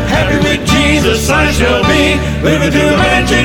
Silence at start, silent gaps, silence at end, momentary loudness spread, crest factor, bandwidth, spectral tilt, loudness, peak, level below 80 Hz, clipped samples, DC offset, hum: 0 s; none; 0 s; 3 LU; 10 dB; 19 kHz; -4.5 dB/octave; -10 LUFS; 0 dBFS; -20 dBFS; under 0.1%; under 0.1%; none